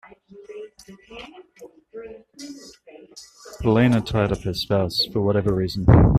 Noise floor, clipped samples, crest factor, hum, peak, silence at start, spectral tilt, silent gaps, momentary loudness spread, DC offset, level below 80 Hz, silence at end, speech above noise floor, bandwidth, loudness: -47 dBFS; under 0.1%; 20 dB; none; -2 dBFS; 0.4 s; -7 dB/octave; none; 24 LU; under 0.1%; -34 dBFS; 0 s; 28 dB; 14.5 kHz; -21 LUFS